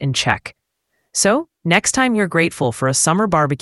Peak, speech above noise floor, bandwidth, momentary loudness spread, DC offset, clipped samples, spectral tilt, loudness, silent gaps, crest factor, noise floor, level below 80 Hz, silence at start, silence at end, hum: 0 dBFS; 53 dB; 12 kHz; 6 LU; under 0.1%; under 0.1%; -3.5 dB/octave; -17 LUFS; none; 18 dB; -70 dBFS; -48 dBFS; 0 s; 0.05 s; none